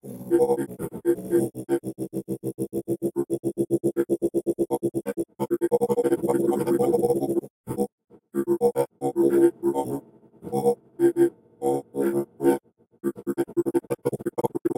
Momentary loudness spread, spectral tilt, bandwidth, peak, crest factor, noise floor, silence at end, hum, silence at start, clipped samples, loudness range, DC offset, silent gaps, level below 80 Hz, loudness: 10 LU; -7.5 dB/octave; 17 kHz; -8 dBFS; 18 dB; -44 dBFS; 0.05 s; none; 0.05 s; under 0.1%; 3 LU; under 0.1%; 7.50-7.64 s, 7.92-7.98 s; -62 dBFS; -26 LUFS